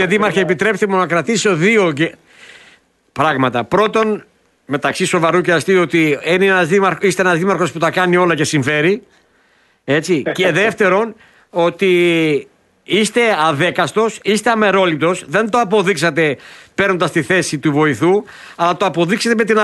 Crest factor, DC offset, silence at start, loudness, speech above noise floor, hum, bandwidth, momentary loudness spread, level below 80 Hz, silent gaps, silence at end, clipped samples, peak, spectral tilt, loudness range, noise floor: 14 dB; under 0.1%; 0 s; -15 LUFS; 41 dB; none; 12.5 kHz; 6 LU; -56 dBFS; none; 0 s; under 0.1%; -2 dBFS; -5 dB/octave; 3 LU; -55 dBFS